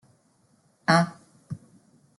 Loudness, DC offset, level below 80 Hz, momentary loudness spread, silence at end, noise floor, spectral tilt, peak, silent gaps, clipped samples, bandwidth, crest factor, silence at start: -24 LUFS; under 0.1%; -68 dBFS; 20 LU; 0.6 s; -65 dBFS; -5.5 dB/octave; -6 dBFS; none; under 0.1%; 11.5 kHz; 24 dB; 0.9 s